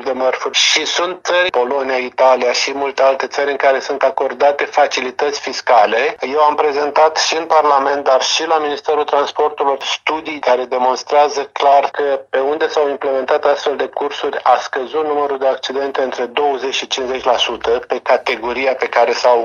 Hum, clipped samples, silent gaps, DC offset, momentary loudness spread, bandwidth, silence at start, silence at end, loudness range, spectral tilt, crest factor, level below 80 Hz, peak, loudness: none; under 0.1%; none; under 0.1%; 6 LU; 10 kHz; 0 s; 0 s; 3 LU; -1 dB/octave; 14 dB; -58 dBFS; 0 dBFS; -15 LUFS